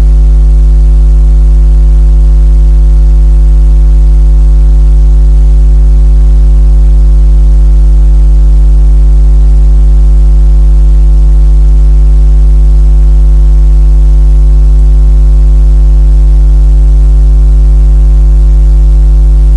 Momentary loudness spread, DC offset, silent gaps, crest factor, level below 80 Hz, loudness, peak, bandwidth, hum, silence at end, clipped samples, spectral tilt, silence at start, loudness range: 0 LU; under 0.1%; none; 2 dB; -2 dBFS; -7 LUFS; 0 dBFS; 1.4 kHz; none; 0 s; 0.3%; -9 dB/octave; 0 s; 0 LU